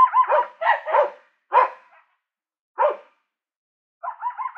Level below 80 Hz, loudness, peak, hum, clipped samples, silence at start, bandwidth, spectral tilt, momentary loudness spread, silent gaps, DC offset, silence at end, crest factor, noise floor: under -90 dBFS; -21 LUFS; -4 dBFS; none; under 0.1%; 0 s; 5.4 kHz; -2 dB/octave; 16 LU; 2.61-2.75 s, 3.56-4.00 s; under 0.1%; 0.05 s; 20 dB; -78 dBFS